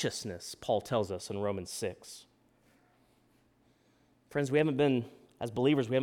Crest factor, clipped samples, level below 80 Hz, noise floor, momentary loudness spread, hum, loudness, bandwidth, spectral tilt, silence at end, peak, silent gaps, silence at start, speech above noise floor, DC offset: 20 dB; under 0.1%; -68 dBFS; -68 dBFS; 15 LU; none; -33 LUFS; 17.5 kHz; -5.5 dB/octave; 0 s; -14 dBFS; none; 0 s; 37 dB; under 0.1%